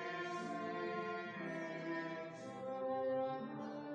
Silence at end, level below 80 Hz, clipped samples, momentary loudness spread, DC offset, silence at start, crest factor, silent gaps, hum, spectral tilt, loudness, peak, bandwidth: 0 s; -86 dBFS; under 0.1%; 7 LU; under 0.1%; 0 s; 14 dB; none; none; -6 dB/octave; -43 LUFS; -30 dBFS; 9.6 kHz